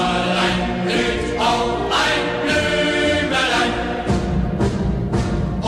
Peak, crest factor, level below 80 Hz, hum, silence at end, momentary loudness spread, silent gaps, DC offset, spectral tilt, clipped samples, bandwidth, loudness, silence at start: -6 dBFS; 14 dB; -30 dBFS; none; 0 s; 4 LU; none; under 0.1%; -5 dB/octave; under 0.1%; 14 kHz; -19 LUFS; 0 s